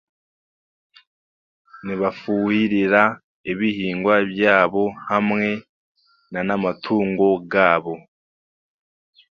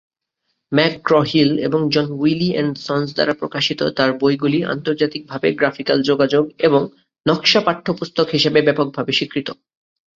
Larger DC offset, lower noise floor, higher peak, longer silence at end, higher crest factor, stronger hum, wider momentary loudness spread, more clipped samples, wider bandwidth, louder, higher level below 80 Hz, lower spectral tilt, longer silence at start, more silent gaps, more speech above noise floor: neither; first, under -90 dBFS vs -74 dBFS; about the same, 0 dBFS vs 0 dBFS; first, 1.35 s vs 0.65 s; about the same, 22 dB vs 18 dB; neither; first, 13 LU vs 7 LU; neither; second, 6.6 kHz vs 7.6 kHz; about the same, -20 LUFS vs -18 LUFS; about the same, -60 dBFS vs -58 dBFS; first, -7.5 dB/octave vs -5.5 dB/octave; first, 1.75 s vs 0.7 s; first, 3.24-3.44 s, 5.69-5.95 s vs none; first, over 71 dB vs 56 dB